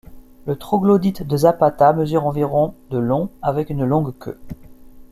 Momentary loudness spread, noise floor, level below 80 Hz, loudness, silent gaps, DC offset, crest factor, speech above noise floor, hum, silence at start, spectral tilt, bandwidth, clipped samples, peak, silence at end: 18 LU; -40 dBFS; -44 dBFS; -18 LUFS; none; under 0.1%; 16 dB; 22 dB; none; 0.1 s; -8.5 dB/octave; 15 kHz; under 0.1%; -2 dBFS; 0.1 s